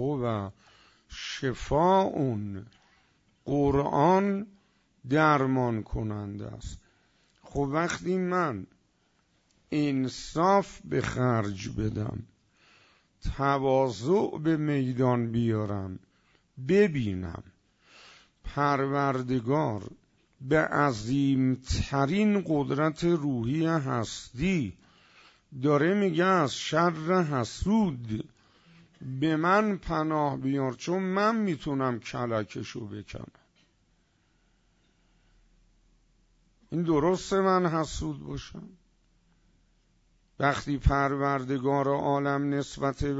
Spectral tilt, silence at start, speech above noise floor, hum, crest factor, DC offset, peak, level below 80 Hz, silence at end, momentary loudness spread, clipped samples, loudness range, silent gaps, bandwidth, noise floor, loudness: -6.5 dB/octave; 0 s; 42 dB; none; 20 dB; under 0.1%; -10 dBFS; -46 dBFS; 0 s; 16 LU; under 0.1%; 5 LU; none; 8 kHz; -70 dBFS; -28 LUFS